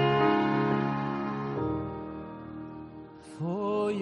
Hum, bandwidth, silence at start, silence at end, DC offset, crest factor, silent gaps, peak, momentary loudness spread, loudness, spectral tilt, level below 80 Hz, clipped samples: none; 9 kHz; 0 s; 0 s; under 0.1%; 16 dB; none; -12 dBFS; 19 LU; -30 LUFS; -8 dB/octave; -56 dBFS; under 0.1%